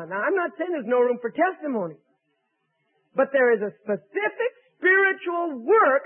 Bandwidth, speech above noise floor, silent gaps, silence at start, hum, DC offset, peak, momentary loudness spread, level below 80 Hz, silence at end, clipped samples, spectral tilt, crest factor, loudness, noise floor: 3.5 kHz; 51 dB; none; 0 s; none; under 0.1%; -10 dBFS; 11 LU; -84 dBFS; 0 s; under 0.1%; -9.5 dB/octave; 14 dB; -23 LUFS; -74 dBFS